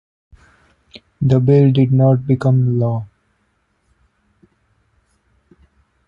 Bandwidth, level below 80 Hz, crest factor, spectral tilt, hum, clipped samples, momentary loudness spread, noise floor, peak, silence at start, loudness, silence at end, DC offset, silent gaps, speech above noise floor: 5.2 kHz; -50 dBFS; 16 dB; -10.5 dB/octave; none; under 0.1%; 9 LU; -64 dBFS; -2 dBFS; 0.95 s; -15 LUFS; 3 s; under 0.1%; none; 51 dB